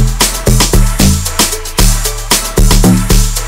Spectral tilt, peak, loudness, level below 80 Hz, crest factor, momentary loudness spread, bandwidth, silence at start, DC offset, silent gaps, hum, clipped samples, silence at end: -3.5 dB/octave; 0 dBFS; -10 LUFS; -12 dBFS; 8 dB; 3 LU; 16.5 kHz; 0 s; under 0.1%; none; none; 0.8%; 0 s